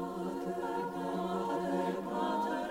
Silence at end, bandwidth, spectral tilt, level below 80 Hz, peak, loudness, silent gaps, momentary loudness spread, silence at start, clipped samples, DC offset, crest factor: 0 s; 16 kHz; -6.5 dB/octave; -66 dBFS; -22 dBFS; -35 LUFS; none; 4 LU; 0 s; under 0.1%; under 0.1%; 14 dB